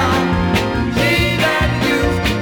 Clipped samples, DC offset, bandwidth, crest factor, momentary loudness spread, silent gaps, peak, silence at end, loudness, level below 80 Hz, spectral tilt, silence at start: under 0.1%; under 0.1%; over 20 kHz; 12 dB; 3 LU; none; -2 dBFS; 0 s; -15 LUFS; -28 dBFS; -5.5 dB/octave; 0 s